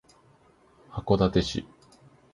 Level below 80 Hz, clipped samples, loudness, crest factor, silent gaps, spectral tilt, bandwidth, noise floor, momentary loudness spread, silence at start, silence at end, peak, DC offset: -46 dBFS; under 0.1%; -26 LUFS; 24 dB; none; -6.5 dB/octave; 11.5 kHz; -60 dBFS; 17 LU; 0.9 s; 0.7 s; -6 dBFS; under 0.1%